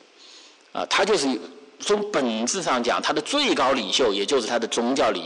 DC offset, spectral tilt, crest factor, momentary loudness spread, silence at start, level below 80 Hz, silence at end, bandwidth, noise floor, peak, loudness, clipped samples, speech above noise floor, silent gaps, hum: under 0.1%; -2 dB/octave; 10 dB; 10 LU; 0.3 s; -60 dBFS; 0 s; 11 kHz; -49 dBFS; -12 dBFS; -22 LUFS; under 0.1%; 26 dB; none; none